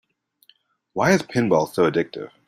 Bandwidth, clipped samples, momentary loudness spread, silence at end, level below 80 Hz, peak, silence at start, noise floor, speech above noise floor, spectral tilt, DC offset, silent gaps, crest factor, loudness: 15 kHz; under 0.1%; 10 LU; 0.2 s; -58 dBFS; -4 dBFS; 0.95 s; -60 dBFS; 40 dB; -5.5 dB/octave; under 0.1%; none; 18 dB; -21 LUFS